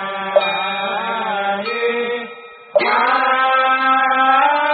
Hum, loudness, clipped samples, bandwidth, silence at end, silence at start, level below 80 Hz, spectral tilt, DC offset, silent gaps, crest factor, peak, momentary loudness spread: none; -16 LUFS; under 0.1%; 4.9 kHz; 0 s; 0 s; -76 dBFS; 0.5 dB/octave; under 0.1%; none; 16 dB; -2 dBFS; 8 LU